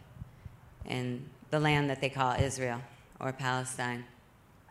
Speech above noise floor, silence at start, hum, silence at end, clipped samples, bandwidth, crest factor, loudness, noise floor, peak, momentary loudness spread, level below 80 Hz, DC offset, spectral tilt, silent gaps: 28 dB; 0 s; none; 0.6 s; under 0.1%; 13.5 kHz; 22 dB; -33 LUFS; -60 dBFS; -14 dBFS; 22 LU; -56 dBFS; under 0.1%; -5 dB/octave; none